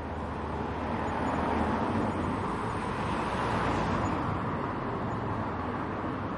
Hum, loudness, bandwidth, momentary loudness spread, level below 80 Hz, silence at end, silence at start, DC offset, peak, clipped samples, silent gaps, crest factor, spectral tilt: none; -31 LUFS; 11.5 kHz; 5 LU; -46 dBFS; 0 s; 0 s; under 0.1%; -16 dBFS; under 0.1%; none; 14 dB; -7 dB/octave